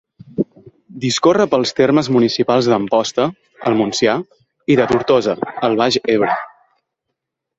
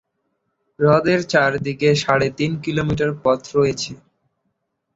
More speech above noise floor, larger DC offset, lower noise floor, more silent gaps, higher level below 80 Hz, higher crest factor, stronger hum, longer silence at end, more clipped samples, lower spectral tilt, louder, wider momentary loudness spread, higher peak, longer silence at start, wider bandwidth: first, 62 dB vs 55 dB; neither; first, -78 dBFS vs -73 dBFS; neither; about the same, -54 dBFS vs -50 dBFS; about the same, 16 dB vs 18 dB; neither; about the same, 1.1 s vs 1 s; neither; about the same, -5 dB/octave vs -5.5 dB/octave; first, -16 LUFS vs -19 LUFS; first, 10 LU vs 6 LU; about the same, -2 dBFS vs -2 dBFS; second, 0.35 s vs 0.8 s; about the same, 8 kHz vs 8 kHz